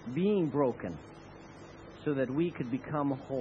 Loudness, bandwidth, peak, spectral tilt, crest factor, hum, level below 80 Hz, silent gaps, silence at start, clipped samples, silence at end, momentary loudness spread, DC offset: -33 LUFS; 7.8 kHz; -16 dBFS; -9 dB/octave; 16 dB; 50 Hz at -60 dBFS; -62 dBFS; none; 0 s; under 0.1%; 0 s; 21 LU; under 0.1%